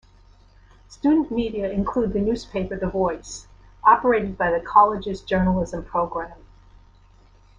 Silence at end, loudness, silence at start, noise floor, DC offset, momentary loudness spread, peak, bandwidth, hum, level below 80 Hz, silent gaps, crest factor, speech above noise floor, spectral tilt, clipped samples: 1.25 s; -22 LUFS; 0.9 s; -52 dBFS; under 0.1%; 12 LU; -2 dBFS; 9.8 kHz; none; -42 dBFS; none; 22 dB; 31 dB; -6.5 dB/octave; under 0.1%